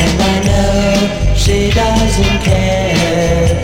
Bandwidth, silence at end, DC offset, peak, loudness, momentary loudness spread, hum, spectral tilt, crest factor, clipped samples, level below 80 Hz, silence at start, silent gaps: 16.5 kHz; 0 s; under 0.1%; 0 dBFS; -12 LUFS; 1 LU; none; -5 dB/octave; 12 dB; under 0.1%; -18 dBFS; 0 s; none